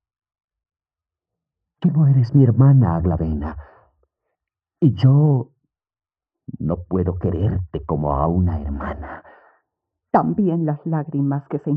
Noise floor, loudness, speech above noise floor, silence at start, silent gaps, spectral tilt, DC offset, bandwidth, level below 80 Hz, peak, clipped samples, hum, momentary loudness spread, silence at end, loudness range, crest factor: under -90 dBFS; -19 LUFS; over 72 dB; 1.8 s; none; -11.5 dB/octave; under 0.1%; 5.2 kHz; -40 dBFS; -4 dBFS; under 0.1%; none; 15 LU; 0 s; 5 LU; 16 dB